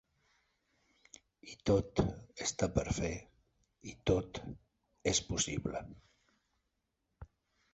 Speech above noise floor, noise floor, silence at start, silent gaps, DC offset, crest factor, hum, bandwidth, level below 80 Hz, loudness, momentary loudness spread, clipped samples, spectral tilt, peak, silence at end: 49 dB; -84 dBFS; 1.45 s; none; under 0.1%; 24 dB; none; 8 kHz; -52 dBFS; -36 LUFS; 20 LU; under 0.1%; -5 dB/octave; -14 dBFS; 0.5 s